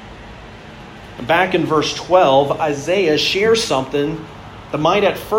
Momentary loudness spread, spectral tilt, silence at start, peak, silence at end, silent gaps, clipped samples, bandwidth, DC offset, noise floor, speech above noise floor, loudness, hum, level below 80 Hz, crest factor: 22 LU; -4.5 dB/octave; 0 s; 0 dBFS; 0 s; none; under 0.1%; 16.5 kHz; under 0.1%; -36 dBFS; 20 dB; -16 LUFS; none; -46 dBFS; 16 dB